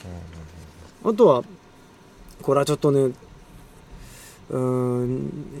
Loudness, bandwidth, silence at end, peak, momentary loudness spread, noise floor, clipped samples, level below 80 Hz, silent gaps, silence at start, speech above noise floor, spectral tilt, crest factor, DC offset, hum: -22 LUFS; 15.5 kHz; 0 s; -4 dBFS; 26 LU; -49 dBFS; under 0.1%; -50 dBFS; none; 0.05 s; 29 dB; -7 dB/octave; 20 dB; under 0.1%; none